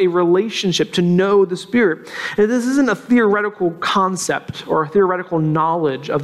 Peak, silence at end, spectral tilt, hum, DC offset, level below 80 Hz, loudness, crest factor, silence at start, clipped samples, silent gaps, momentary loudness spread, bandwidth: -4 dBFS; 0 s; -5.5 dB/octave; none; under 0.1%; -56 dBFS; -17 LUFS; 12 dB; 0 s; under 0.1%; none; 6 LU; 13 kHz